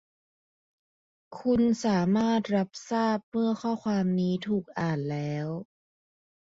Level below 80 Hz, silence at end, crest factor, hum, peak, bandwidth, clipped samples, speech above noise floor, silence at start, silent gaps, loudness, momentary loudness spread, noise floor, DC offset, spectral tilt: -62 dBFS; 0.85 s; 14 dB; none; -14 dBFS; 7.8 kHz; under 0.1%; over 63 dB; 1.3 s; 3.23-3.32 s; -28 LUFS; 8 LU; under -90 dBFS; under 0.1%; -7 dB/octave